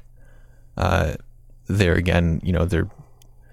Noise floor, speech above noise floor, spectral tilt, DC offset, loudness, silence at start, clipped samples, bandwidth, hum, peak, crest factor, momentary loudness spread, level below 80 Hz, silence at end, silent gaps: -48 dBFS; 28 dB; -7 dB/octave; under 0.1%; -22 LUFS; 0.75 s; under 0.1%; 13 kHz; none; -2 dBFS; 20 dB; 16 LU; -34 dBFS; 0.5 s; none